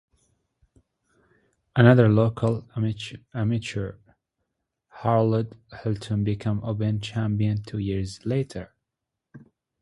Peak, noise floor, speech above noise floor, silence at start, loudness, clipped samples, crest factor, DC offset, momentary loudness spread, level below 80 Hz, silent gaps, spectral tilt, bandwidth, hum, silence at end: -2 dBFS; -85 dBFS; 61 dB; 1.75 s; -25 LUFS; under 0.1%; 24 dB; under 0.1%; 16 LU; -50 dBFS; none; -8 dB/octave; 11 kHz; none; 0.45 s